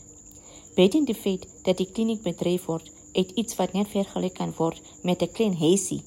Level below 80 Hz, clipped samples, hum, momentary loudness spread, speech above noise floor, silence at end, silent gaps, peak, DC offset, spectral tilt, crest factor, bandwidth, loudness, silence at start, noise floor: -58 dBFS; under 0.1%; none; 11 LU; 23 dB; 0.05 s; none; -8 dBFS; under 0.1%; -5.5 dB/octave; 18 dB; 16 kHz; -26 LUFS; 0.1 s; -48 dBFS